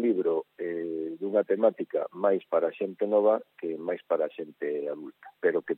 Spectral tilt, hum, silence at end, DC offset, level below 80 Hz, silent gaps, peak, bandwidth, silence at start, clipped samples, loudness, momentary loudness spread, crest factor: -9.5 dB/octave; none; 0 s; under 0.1%; under -90 dBFS; none; -10 dBFS; 4 kHz; 0 s; under 0.1%; -29 LUFS; 10 LU; 18 dB